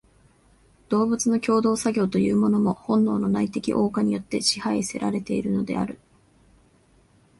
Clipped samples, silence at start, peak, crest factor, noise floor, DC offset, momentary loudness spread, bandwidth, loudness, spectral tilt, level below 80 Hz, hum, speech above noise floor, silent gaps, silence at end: under 0.1%; 0.9 s; -4 dBFS; 20 dB; -59 dBFS; under 0.1%; 6 LU; 11.5 kHz; -23 LUFS; -5 dB/octave; -56 dBFS; none; 36 dB; none; 1.45 s